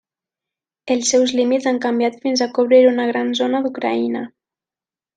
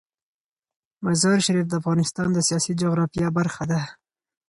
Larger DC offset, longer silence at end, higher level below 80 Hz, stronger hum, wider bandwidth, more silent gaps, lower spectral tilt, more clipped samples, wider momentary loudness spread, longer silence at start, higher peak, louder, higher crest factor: neither; first, 0.9 s vs 0.55 s; second, -68 dBFS vs -56 dBFS; neither; second, 9.4 kHz vs 11.5 kHz; neither; second, -2.5 dB/octave vs -5 dB/octave; neither; about the same, 9 LU vs 7 LU; second, 0.85 s vs 1 s; first, -2 dBFS vs -8 dBFS; first, -17 LUFS vs -22 LUFS; about the same, 16 dB vs 16 dB